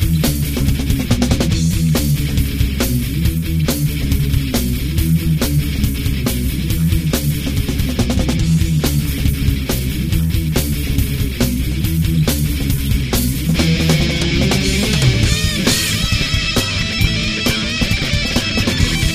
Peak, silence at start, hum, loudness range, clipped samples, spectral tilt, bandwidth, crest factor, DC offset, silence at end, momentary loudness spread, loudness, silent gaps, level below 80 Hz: 0 dBFS; 0 s; none; 3 LU; under 0.1%; -4.5 dB/octave; 15.5 kHz; 16 dB; 0.1%; 0 s; 4 LU; -16 LUFS; none; -22 dBFS